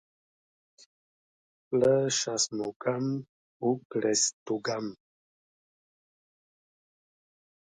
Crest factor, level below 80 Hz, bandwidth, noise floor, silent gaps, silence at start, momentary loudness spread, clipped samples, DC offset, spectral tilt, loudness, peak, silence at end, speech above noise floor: 20 dB; -74 dBFS; 10.5 kHz; under -90 dBFS; 2.76-2.80 s, 3.29-3.60 s, 3.85-3.90 s, 4.33-4.46 s; 1.7 s; 9 LU; under 0.1%; under 0.1%; -3.5 dB/octave; -29 LUFS; -12 dBFS; 2.8 s; over 61 dB